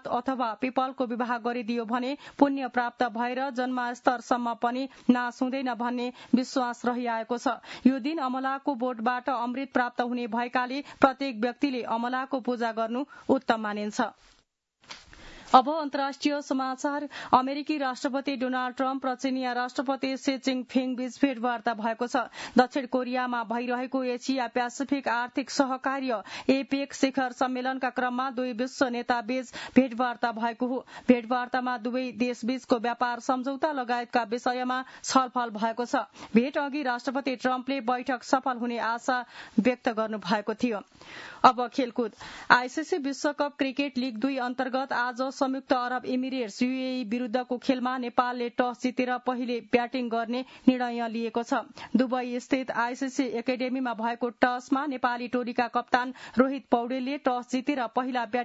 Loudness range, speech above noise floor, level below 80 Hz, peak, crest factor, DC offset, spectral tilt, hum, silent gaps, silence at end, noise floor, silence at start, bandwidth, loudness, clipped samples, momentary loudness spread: 2 LU; 40 dB; -70 dBFS; -2 dBFS; 26 dB; under 0.1%; -4.5 dB/octave; none; none; 0 s; -68 dBFS; 0.05 s; 8 kHz; -28 LUFS; under 0.1%; 6 LU